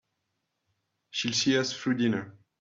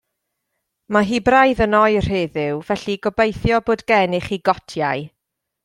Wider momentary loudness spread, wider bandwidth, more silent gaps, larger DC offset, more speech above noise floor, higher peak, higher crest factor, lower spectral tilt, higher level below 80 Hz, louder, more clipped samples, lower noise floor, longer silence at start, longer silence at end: about the same, 11 LU vs 9 LU; second, 7.8 kHz vs 12.5 kHz; neither; neither; second, 53 dB vs 59 dB; second, -14 dBFS vs -2 dBFS; about the same, 18 dB vs 18 dB; second, -3.5 dB/octave vs -6 dB/octave; second, -72 dBFS vs -40 dBFS; second, -28 LUFS vs -18 LUFS; neither; first, -81 dBFS vs -76 dBFS; first, 1.15 s vs 0.9 s; second, 0.3 s vs 0.55 s